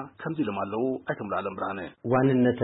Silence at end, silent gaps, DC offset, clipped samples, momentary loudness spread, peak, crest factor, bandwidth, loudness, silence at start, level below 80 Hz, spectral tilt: 0 s; none; under 0.1%; under 0.1%; 11 LU; -12 dBFS; 16 dB; 4 kHz; -28 LUFS; 0 s; -64 dBFS; -11.5 dB/octave